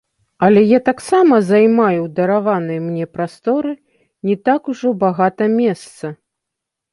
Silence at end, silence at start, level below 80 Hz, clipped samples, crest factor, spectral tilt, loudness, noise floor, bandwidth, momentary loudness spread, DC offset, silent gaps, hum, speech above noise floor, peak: 0.8 s; 0.4 s; -60 dBFS; under 0.1%; 14 dB; -7.5 dB/octave; -15 LUFS; -81 dBFS; 11.5 kHz; 14 LU; under 0.1%; none; none; 66 dB; 0 dBFS